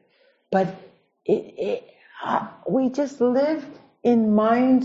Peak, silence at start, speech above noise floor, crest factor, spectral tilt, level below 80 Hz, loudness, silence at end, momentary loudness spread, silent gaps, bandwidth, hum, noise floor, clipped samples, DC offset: -6 dBFS; 0.5 s; 41 dB; 16 dB; -7.5 dB/octave; -66 dBFS; -23 LUFS; 0 s; 12 LU; none; 7.6 kHz; none; -62 dBFS; under 0.1%; under 0.1%